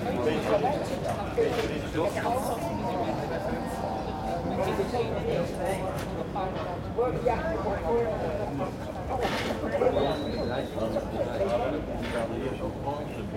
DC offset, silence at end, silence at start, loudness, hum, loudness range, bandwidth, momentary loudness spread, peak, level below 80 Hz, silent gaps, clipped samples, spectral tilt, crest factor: under 0.1%; 0 s; 0 s; -30 LUFS; none; 2 LU; 16.5 kHz; 6 LU; -12 dBFS; -44 dBFS; none; under 0.1%; -6 dB/octave; 18 dB